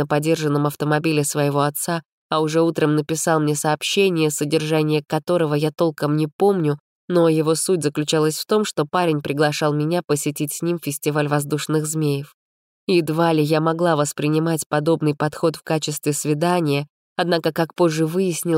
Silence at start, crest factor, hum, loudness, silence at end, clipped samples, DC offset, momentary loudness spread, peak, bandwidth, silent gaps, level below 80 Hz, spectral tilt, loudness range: 0 s; 14 dB; none; -20 LUFS; 0 s; under 0.1%; under 0.1%; 5 LU; -6 dBFS; 16 kHz; 2.08-2.30 s, 6.33-6.39 s, 6.80-7.08 s, 12.34-12.87 s, 14.66-14.70 s, 16.90-17.16 s; -66 dBFS; -5 dB/octave; 2 LU